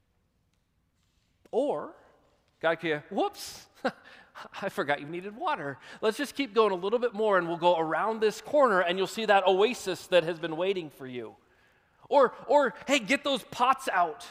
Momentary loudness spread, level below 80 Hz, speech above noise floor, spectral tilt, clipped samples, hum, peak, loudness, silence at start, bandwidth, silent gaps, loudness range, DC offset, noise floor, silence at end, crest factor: 14 LU; -72 dBFS; 45 dB; -4 dB/octave; under 0.1%; none; -8 dBFS; -28 LUFS; 1.55 s; 15.5 kHz; none; 8 LU; under 0.1%; -73 dBFS; 0 s; 20 dB